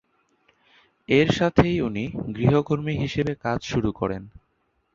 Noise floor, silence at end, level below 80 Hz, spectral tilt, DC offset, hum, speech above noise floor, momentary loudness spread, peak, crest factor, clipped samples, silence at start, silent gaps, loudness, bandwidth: -70 dBFS; 0.65 s; -44 dBFS; -7 dB/octave; under 0.1%; none; 48 dB; 10 LU; -2 dBFS; 22 dB; under 0.1%; 1.1 s; none; -23 LUFS; 7.6 kHz